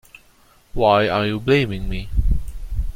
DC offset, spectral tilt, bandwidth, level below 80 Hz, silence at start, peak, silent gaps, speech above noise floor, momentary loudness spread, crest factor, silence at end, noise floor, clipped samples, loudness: under 0.1%; -7 dB/octave; 16 kHz; -26 dBFS; 0.75 s; -2 dBFS; none; 35 dB; 13 LU; 18 dB; 0.05 s; -53 dBFS; under 0.1%; -20 LUFS